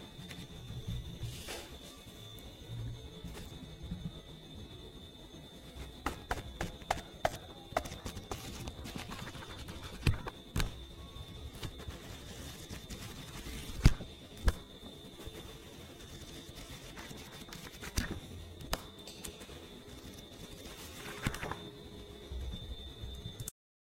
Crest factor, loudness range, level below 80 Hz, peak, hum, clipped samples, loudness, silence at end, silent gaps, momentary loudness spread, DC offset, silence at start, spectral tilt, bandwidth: 32 dB; 8 LU; -46 dBFS; -8 dBFS; none; under 0.1%; -43 LUFS; 0.45 s; none; 12 LU; under 0.1%; 0 s; -4.5 dB/octave; 16 kHz